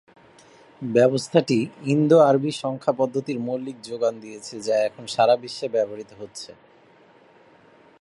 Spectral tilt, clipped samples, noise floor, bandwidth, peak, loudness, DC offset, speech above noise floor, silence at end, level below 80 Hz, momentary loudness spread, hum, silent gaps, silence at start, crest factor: -6 dB/octave; under 0.1%; -54 dBFS; 11.5 kHz; -2 dBFS; -22 LUFS; under 0.1%; 32 dB; 1.55 s; -70 dBFS; 19 LU; none; none; 0.8 s; 22 dB